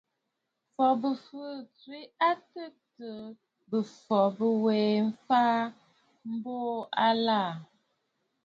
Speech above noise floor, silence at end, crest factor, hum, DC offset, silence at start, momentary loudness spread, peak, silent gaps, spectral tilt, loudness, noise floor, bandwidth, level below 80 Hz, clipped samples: 54 dB; 0.8 s; 18 dB; none; under 0.1%; 0.8 s; 20 LU; -12 dBFS; none; -7 dB/octave; -28 LUFS; -83 dBFS; 7.2 kHz; -80 dBFS; under 0.1%